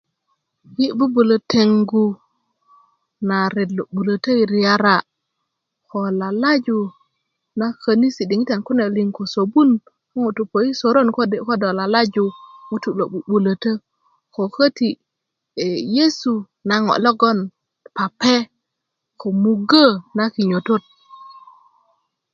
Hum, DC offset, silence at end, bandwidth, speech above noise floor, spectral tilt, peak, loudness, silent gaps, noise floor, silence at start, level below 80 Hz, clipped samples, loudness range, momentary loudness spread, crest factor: none; under 0.1%; 0.95 s; 7.2 kHz; 62 dB; -6 dB/octave; 0 dBFS; -18 LUFS; none; -80 dBFS; 0.7 s; -64 dBFS; under 0.1%; 3 LU; 11 LU; 18 dB